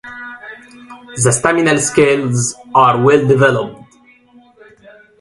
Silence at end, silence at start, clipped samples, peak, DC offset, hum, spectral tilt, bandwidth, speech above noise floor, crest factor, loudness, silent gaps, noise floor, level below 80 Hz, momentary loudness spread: 1.45 s; 0.05 s; under 0.1%; 0 dBFS; under 0.1%; none; -4.5 dB/octave; 11.5 kHz; 36 dB; 16 dB; -12 LUFS; none; -48 dBFS; -50 dBFS; 19 LU